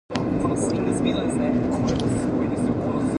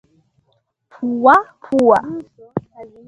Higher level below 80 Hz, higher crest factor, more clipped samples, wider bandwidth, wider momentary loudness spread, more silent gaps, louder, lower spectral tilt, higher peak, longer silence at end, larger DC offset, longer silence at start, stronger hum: first, -42 dBFS vs -58 dBFS; about the same, 16 dB vs 18 dB; neither; about the same, 11 kHz vs 11 kHz; second, 1 LU vs 16 LU; neither; second, -23 LUFS vs -15 LUFS; about the same, -6.5 dB/octave vs -7 dB/octave; second, -6 dBFS vs 0 dBFS; second, 0 s vs 0.2 s; neither; second, 0.1 s vs 1 s; neither